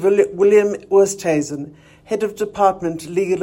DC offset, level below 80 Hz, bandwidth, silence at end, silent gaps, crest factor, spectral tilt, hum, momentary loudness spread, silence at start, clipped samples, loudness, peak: under 0.1%; -56 dBFS; 16.5 kHz; 0 s; none; 16 dB; -5.5 dB/octave; none; 13 LU; 0 s; under 0.1%; -18 LUFS; -2 dBFS